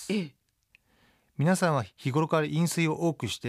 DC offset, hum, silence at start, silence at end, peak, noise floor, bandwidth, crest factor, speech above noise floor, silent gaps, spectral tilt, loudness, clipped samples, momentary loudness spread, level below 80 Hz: under 0.1%; none; 0 s; 0 s; -12 dBFS; -67 dBFS; 15 kHz; 16 dB; 40 dB; none; -5.5 dB/octave; -28 LUFS; under 0.1%; 7 LU; -68 dBFS